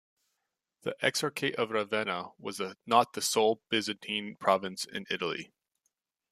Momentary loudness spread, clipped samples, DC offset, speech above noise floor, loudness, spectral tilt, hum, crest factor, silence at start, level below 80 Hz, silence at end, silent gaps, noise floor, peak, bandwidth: 12 LU; under 0.1%; under 0.1%; 53 dB; -31 LUFS; -3 dB/octave; none; 24 dB; 0.85 s; -78 dBFS; 0.85 s; none; -84 dBFS; -10 dBFS; 15 kHz